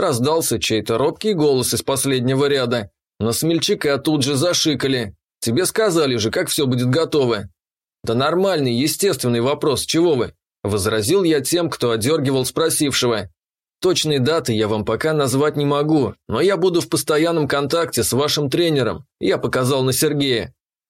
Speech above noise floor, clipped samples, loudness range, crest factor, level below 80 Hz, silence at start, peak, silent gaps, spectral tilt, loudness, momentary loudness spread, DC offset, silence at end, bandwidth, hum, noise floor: 72 dB; under 0.1%; 1 LU; 12 dB; -52 dBFS; 0 s; -6 dBFS; none; -4.5 dB/octave; -18 LUFS; 5 LU; under 0.1%; 0.4 s; 16.5 kHz; none; -90 dBFS